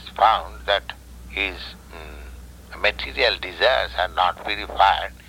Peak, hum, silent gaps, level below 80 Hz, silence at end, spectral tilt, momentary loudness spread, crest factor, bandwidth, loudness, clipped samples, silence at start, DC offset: -6 dBFS; none; none; -40 dBFS; 0.05 s; -3.5 dB/octave; 21 LU; 18 dB; 16.5 kHz; -21 LUFS; under 0.1%; 0 s; under 0.1%